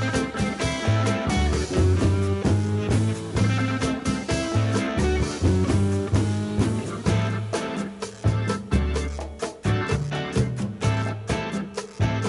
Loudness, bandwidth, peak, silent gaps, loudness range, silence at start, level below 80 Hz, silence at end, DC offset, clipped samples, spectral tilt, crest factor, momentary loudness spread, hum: -24 LUFS; 11.5 kHz; -10 dBFS; none; 3 LU; 0 s; -32 dBFS; 0 s; under 0.1%; under 0.1%; -6 dB/octave; 14 dB; 6 LU; none